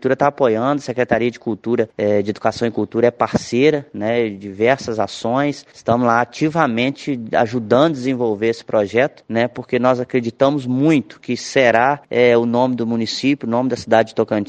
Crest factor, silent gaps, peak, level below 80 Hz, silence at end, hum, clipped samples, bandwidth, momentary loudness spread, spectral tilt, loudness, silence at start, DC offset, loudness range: 18 dB; none; 0 dBFS; -56 dBFS; 0.05 s; none; under 0.1%; 9.2 kHz; 6 LU; -6 dB/octave; -18 LUFS; 0 s; under 0.1%; 2 LU